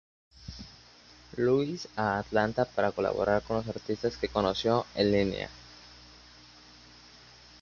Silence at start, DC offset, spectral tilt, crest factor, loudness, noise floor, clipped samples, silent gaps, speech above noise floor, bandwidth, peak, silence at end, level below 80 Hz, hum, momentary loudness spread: 0.4 s; under 0.1%; -6 dB/octave; 20 dB; -29 LUFS; -55 dBFS; under 0.1%; none; 26 dB; 7.2 kHz; -10 dBFS; 1.55 s; -54 dBFS; 60 Hz at -55 dBFS; 22 LU